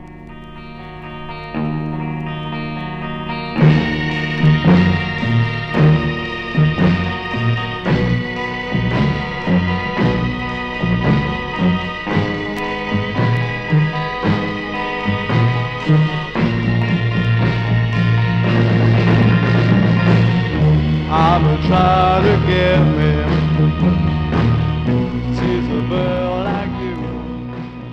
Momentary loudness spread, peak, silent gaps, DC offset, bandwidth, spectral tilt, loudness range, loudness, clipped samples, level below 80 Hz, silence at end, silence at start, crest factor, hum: 11 LU; 0 dBFS; none; under 0.1%; 6.6 kHz; -8 dB/octave; 5 LU; -16 LUFS; under 0.1%; -32 dBFS; 0 s; 0 s; 16 dB; none